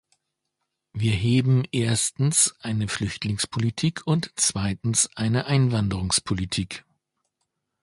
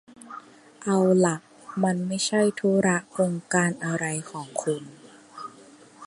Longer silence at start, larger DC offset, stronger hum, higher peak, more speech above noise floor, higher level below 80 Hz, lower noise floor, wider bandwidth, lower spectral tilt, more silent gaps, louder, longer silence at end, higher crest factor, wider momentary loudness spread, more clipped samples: first, 0.95 s vs 0.25 s; neither; neither; about the same, -6 dBFS vs -6 dBFS; first, 57 dB vs 26 dB; first, -46 dBFS vs -70 dBFS; first, -80 dBFS vs -50 dBFS; about the same, 11.5 kHz vs 11.5 kHz; about the same, -4 dB/octave vs -5 dB/octave; neither; about the same, -23 LUFS vs -25 LUFS; first, 1 s vs 0 s; about the same, 18 dB vs 20 dB; second, 7 LU vs 21 LU; neither